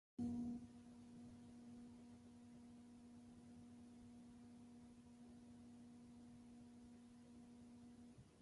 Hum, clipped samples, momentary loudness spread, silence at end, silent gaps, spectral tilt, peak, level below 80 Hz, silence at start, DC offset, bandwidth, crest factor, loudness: none; under 0.1%; 12 LU; 0 s; none; -7 dB/octave; -36 dBFS; -76 dBFS; 0.2 s; under 0.1%; 11.5 kHz; 20 dB; -59 LUFS